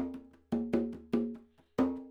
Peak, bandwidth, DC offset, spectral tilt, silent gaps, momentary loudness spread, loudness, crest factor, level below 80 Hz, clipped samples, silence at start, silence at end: -16 dBFS; 7.4 kHz; under 0.1%; -8 dB/octave; none; 10 LU; -35 LUFS; 18 dB; -60 dBFS; under 0.1%; 0 s; 0 s